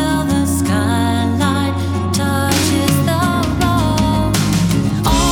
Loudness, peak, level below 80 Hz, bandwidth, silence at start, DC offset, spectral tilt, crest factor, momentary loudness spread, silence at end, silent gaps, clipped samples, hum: -15 LUFS; 0 dBFS; -28 dBFS; 18.5 kHz; 0 s; under 0.1%; -5 dB/octave; 14 dB; 2 LU; 0 s; none; under 0.1%; none